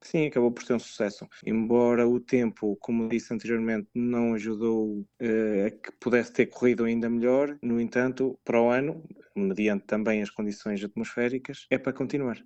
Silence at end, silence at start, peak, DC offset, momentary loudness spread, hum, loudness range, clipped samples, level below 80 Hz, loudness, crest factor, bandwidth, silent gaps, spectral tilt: 0.05 s; 0.05 s; -8 dBFS; under 0.1%; 8 LU; none; 2 LU; under 0.1%; -62 dBFS; -27 LUFS; 18 dB; 8.4 kHz; none; -7 dB/octave